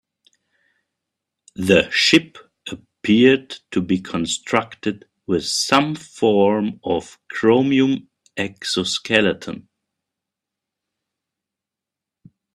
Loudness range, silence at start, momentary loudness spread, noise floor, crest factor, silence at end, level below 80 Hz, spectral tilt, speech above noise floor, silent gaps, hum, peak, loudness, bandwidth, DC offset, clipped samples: 6 LU; 1.6 s; 19 LU; -86 dBFS; 20 dB; 2.95 s; -58 dBFS; -4 dB/octave; 68 dB; none; none; 0 dBFS; -19 LUFS; 13 kHz; under 0.1%; under 0.1%